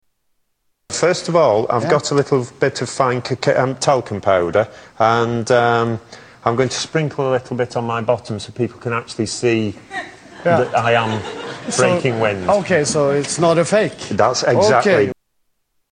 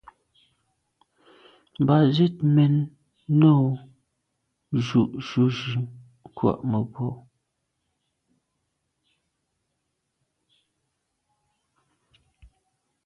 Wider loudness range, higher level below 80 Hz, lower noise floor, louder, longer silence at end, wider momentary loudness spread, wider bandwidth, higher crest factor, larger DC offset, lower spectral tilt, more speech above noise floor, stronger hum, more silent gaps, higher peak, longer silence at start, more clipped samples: second, 5 LU vs 10 LU; first, -54 dBFS vs -62 dBFS; second, -67 dBFS vs -78 dBFS; first, -17 LUFS vs -23 LUFS; second, 0.8 s vs 5.85 s; second, 9 LU vs 14 LU; first, 10.5 kHz vs 6.6 kHz; about the same, 16 dB vs 20 dB; neither; second, -5 dB/octave vs -8.5 dB/octave; second, 50 dB vs 57 dB; neither; neither; first, -2 dBFS vs -6 dBFS; second, 0.9 s vs 1.8 s; neither